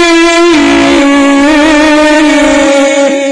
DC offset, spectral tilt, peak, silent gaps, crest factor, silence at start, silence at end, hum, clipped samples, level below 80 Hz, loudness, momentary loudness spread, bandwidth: under 0.1%; -2.5 dB/octave; 0 dBFS; none; 6 dB; 0 s; 0 s; none; 0.4%; -32 dBFS; -5 LUFS; 2 LU; 10.5 kHz